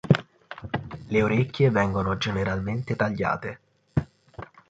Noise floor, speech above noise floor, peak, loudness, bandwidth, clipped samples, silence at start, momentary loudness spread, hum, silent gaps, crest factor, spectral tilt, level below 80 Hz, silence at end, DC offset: -44 dBFS; 20 dB; -4 dBFS; -26 LUFS; 7.8 kHz; under 0.1%; 0.05 s; 21 LU; none; none; 22 dB; -7.5 dB/octave; -46 dBFS; 0.25 s; under 0.1%